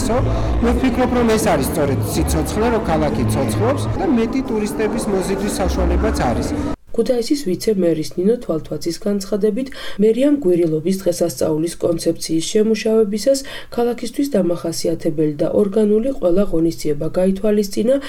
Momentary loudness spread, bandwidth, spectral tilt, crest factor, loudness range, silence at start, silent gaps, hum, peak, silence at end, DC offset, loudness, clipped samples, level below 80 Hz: 5 LU; 18.5 kHz; -6 dB/octave; 12 dB; 2 LU; 0 s; none; none; -6 dBFS; 0 s; under 0.1%; -18 LUFS; under 0.1%; -30 dBFS